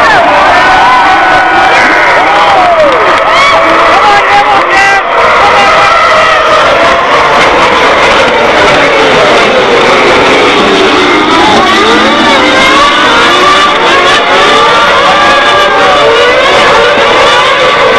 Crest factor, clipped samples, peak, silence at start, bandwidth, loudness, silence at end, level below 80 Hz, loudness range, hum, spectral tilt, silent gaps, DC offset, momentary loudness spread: 4 dB; 10%; 0 dBFS; 0 s; 12 kHz; -3 LUFS; 0 s; -32 dBFS; 1 LU; none; -3 dB/octave; none; 0.9%; 1 LU